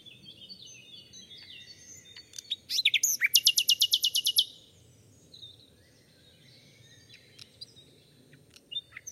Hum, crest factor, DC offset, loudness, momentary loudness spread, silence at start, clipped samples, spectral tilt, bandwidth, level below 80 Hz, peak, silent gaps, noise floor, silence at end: none; 28 dB; under 0.1%; -25 LUFS; 26 LU; 0.05 s; under 0.1%; 3 dB/octave; 16.5 kHz; -76 dBFS; -6 dBFS; none; -60 dBFS; 0 s